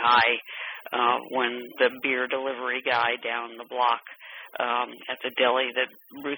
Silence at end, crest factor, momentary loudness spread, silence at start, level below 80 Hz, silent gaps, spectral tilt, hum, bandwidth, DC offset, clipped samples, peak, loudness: 0 s; 18 dB; 12 LU; 0 s; -76 dBFS; none; -5 dB/octave; none; over 20 kHz; under 0.1%; under 0.1%; -8 dBFS; -26 LUFS